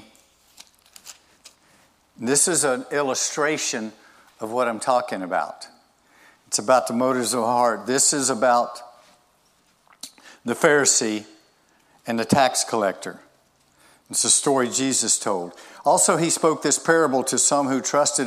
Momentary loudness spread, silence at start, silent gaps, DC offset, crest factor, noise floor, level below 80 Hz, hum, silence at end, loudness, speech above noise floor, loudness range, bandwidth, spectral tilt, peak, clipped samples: 16 LU; 1.05 s; none; under 0.1%; 20 dB; -62 dBFS; -70 dBFS; none; 0 s; -20 LUFS; 41 dB; 5 LU; 15.5 kHz; -2.5 dB/octave; -2 dBFS; under 0.1%